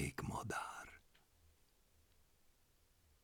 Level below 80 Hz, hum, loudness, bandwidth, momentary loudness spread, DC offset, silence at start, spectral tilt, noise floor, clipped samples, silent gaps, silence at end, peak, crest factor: -66 dBFS; none; -46 LUFS; 19.5 kHz; 15 LU; under 0.1%; 0 s; -4.5 dB/octave; -74 dBFS; under 0.1%; none; 1.75 s; -28 dBFS; 22 dB